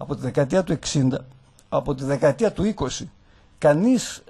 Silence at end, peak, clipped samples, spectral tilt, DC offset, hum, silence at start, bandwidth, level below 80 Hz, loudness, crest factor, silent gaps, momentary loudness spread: 0.1 s; -6 dBFS; under 0.1%; -6 dB/octave; under 0.1%; none; 0 s; 12 kHz; -46 dBFS; -22 LUFS; 18 dB; none; 9 LU